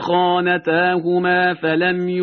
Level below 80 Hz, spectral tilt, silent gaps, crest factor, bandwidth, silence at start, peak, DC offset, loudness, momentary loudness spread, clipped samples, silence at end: -60 dBFS; -3.5 dB/octave; none; 14 dB; 6 kHz; 0 s; -4 dBFS; under 0.1%; -17 LUFS; 2 LU; under 0.1%; 0 s